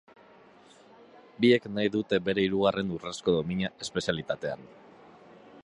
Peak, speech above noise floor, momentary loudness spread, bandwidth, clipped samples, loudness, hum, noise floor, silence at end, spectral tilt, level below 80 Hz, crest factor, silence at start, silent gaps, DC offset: -10 dBFS; 28 dB; 10 LU; 11 kHz; under 0.1%; -28 LUFS; none; -56 dBFS; 0.05 s; -5.5 dB/octave; -60 dBFS; 20 dB; 1.4 s; none; under 0.1%